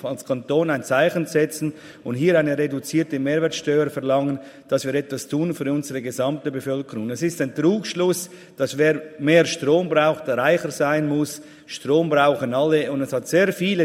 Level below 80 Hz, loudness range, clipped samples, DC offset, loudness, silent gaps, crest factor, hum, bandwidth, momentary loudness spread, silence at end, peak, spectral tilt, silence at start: -66 dBFS; 4 LU; under 0.1%; under 0.1%; -21 LUFS; none; 18 dB; none; 16 kHz; 9 LU; 0 s; -2 dBFS; -5.5 dB/octave; 0 s